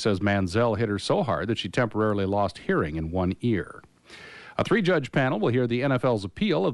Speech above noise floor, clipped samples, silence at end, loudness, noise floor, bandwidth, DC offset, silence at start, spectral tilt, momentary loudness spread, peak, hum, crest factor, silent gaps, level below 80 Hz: 22 dB; under 0.1%; 0 s; -25 LUFS; -47 dBFS; 11.5 kHz; under 0.1%; 0 s; -6.5 dB/octave; 6 LU; -10 dBFS; none; 14 dB; none; -50 dBFS